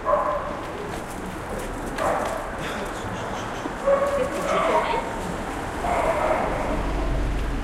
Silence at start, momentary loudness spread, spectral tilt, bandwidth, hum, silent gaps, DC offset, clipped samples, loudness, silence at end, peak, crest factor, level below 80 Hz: 0 s; 10 LU; -5 dB/octave; 16 kHz; none; none; under 0.1%; under 0.1%; -26 LUFS; 0 s; -8 dBFS; 16 dB; -34 dBFS